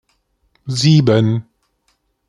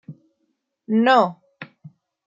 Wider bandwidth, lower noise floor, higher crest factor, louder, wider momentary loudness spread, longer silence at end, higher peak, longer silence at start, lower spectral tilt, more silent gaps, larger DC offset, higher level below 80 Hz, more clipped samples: first, 11 kHz vs 7.6 kHz; second, -65 dBFS vs -73 dBFS; about the same, 16 dB vs 20 dB; first, -15 LUFS vs -18 LUFS; second, 12 LU vs 25 LU; first, 0.85 s vs 0.4 s; about the same, -2 dBFS vs -4 dBFS; first, 0.65 s vs 0.1 s; about the same, -6.5 dB/octave vs -6.5 dB/octave; neither; neither; first, -52 dBFS vs -76 dBFS; neither